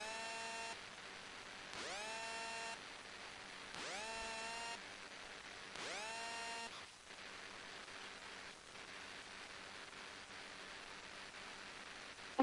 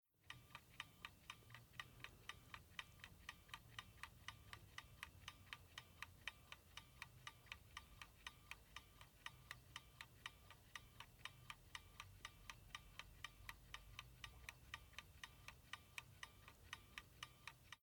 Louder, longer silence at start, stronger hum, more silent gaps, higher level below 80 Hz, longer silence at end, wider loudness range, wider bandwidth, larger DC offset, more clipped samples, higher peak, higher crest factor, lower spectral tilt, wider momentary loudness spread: first, -49 LUFS vs -59 LUFS; second, 0 s vs 0.15 s; neither; neither; about the same, -76 dBFS vs -72 dBFS; about the same, 0 s vs 0.05 s; first, 5 LU vs 1 LU; second, 11.5 kHz vs 19.5 kHz; neither; neither; first, -20 dBFS vs -32 dBFS; about the same, 28 dB vs 28 dB; about the same, -1.5 dB/octave vs -2 dB/octave; about the same, 7 LU vs 5 LU